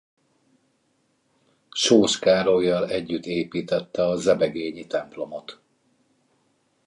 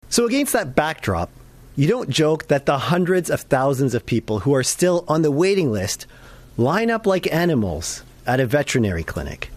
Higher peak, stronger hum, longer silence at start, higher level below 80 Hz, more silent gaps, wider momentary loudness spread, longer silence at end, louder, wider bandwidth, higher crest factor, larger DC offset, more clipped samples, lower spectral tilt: about the same, -4 dBFS vs -4 dBFS; neither; first, 1.75 s vs 0.1 s; second, -60 dBFS vs -44 dBFS; neither; first, 16 LU vs 9 LU; first, 1.3 s vs 0 s; second, -23 LUFS vs -20 LUFS; second, 11.5 kHz vs 15.5 kHz; first, 22 dB vs 16 dB; neither; neither; about the same, -4 dB/octave vs -5 dB/octave